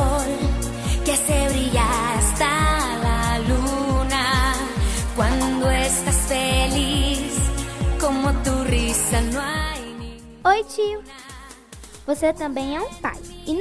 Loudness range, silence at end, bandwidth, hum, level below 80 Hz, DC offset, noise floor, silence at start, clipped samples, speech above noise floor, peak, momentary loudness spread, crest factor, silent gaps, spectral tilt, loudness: 5 LU; 0 s; 11 kHz; none; -26 dBFS; under 0.1%; -42 dBFS; 0 s; under 0.1%; 19 dB; -6 dBFS; 12 LU; 16 dB; none; -4 dB/octave; -21 LUFS